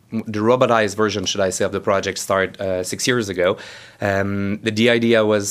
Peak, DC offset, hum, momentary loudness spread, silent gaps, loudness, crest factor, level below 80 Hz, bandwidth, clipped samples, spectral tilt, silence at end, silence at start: 0 dBFS; under 0.1%; none; 8 LU; none; -19 LUFS; 18 dB; -58 dBFS; 15.5 kHz; under 0.1%; -4 dB/octave; 0 s; 0.1 s